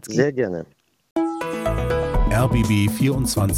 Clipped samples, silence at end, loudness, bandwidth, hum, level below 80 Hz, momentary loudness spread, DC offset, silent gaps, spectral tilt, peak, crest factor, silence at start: under 0.1%; 0 s; -21 LUFS; 17 kHz; none; -28 dBFS; 7 LU; under 0.1%; 1.11-1.16 s; -6 dB/octave; -4 dBFS; 16 dB; 0.05 s